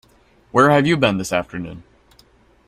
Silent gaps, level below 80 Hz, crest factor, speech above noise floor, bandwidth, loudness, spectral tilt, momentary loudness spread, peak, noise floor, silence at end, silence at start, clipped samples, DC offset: none; -50 dBFS; 18 dB; 37 dB; 15.5 kHz; -17 LUFS; -5.5 dB/octave; 17 LU; -2 dBFS; -54 dBFS; 0.85 s; 0.55 s; under 0.1%; under 0.1%